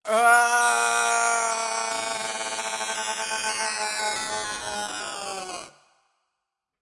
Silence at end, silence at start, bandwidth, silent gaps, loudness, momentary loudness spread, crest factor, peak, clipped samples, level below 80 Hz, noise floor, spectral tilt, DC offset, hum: 1.15 s; 0.05 s; 12 kHz; none; -24 LUFS; 13 LU; 20 dB; -6 dBFS; under 0.1%; -66 dBFS; -83 dBFS; 0.5 dB/octave; under 0.1%; none